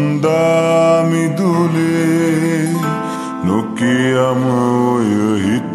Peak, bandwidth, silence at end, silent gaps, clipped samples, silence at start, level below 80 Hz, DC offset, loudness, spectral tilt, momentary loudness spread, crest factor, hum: -2 dBFS; 13.5 kHz; 0 s; none; under 0.1%; 0 s; -56 dBFS; under 0.1%; -15 LUFS; -6.5 dB/octave; 5 LU; 12 dB; none